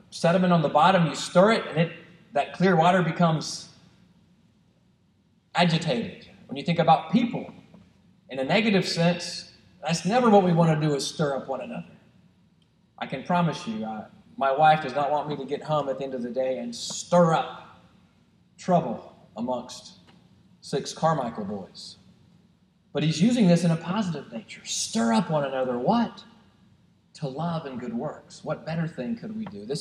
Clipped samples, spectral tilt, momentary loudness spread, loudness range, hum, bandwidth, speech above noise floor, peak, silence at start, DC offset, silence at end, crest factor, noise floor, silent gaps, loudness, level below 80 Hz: under 0.1%; -5.5 dB/octave; 17 LU; 8 LU; none; 11 kHz; 39 dB; -6 dBFS; 0.1 s; under 0.1%; 0 s; 20 dB; -64 dBFS; none; -25 LUFS; -68 dBFS